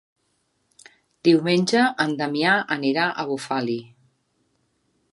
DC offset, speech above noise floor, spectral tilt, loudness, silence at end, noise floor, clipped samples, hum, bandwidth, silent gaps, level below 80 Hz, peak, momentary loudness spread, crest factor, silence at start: under 0.1%; 49 dB; -5 dB/octave; -21 LUFS; 1.25 s; -70 dBFS; under 0.1%; none; 11.5 kHz; none; -72 dBFS; -4 dBFS; 8 LU; 20 dB; 1.25 s